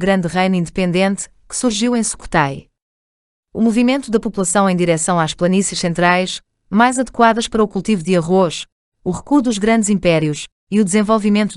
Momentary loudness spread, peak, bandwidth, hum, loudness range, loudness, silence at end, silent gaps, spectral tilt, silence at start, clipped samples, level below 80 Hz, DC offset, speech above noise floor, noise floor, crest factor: 10 LU; 0 dBFS; 11.5 kHz; none; 3 LU; -16 LUFS; 0 s; 2.82-3.43 s, 8.72-8.92 s, 10.52-10.67 s; -5 dB/octave; 0 s; under 0.1%; -44 dBFS; under 0.1%; over 75 dB; under -90 dBFS; 16 dB